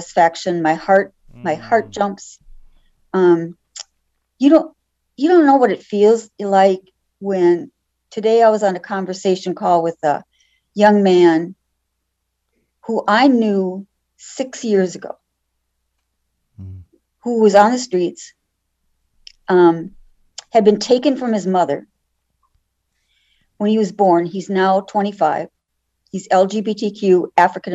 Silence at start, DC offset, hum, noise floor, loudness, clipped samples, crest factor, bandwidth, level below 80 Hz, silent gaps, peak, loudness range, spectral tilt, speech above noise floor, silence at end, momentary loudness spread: 0 s; under 0.1%; none; -73 dBFS; -16 LUFS; under 0.1%; 16 dB; 8 kHz; -58 dBFS; none; 0 dBFS; 5 LU; -6 dB/octave; 58 dB; 0 s; 19 LU